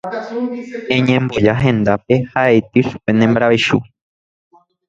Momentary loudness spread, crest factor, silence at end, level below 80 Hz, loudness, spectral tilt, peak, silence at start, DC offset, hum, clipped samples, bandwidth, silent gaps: 10 LU; 16 dB; 1.05 s; -46 dBFS; -15 LUFS; -7 dB/octave; 0 dBFS; 0.05 s; under 0.1%; none; under 0.1%; 7.8 kHz; none